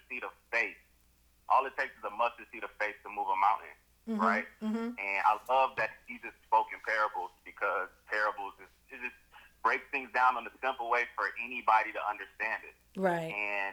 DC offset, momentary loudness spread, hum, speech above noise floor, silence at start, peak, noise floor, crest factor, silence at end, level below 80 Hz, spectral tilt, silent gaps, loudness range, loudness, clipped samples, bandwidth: under 0.1%; 13 LU; none; 34 dB; 0.1 s; -14 dBFS; -67 dBFS; 20 dB; 0 s; -70 dBFS; -5 dB/octave; none; 3 LU; -32 LUFS; under 0.1%; over 20 kHz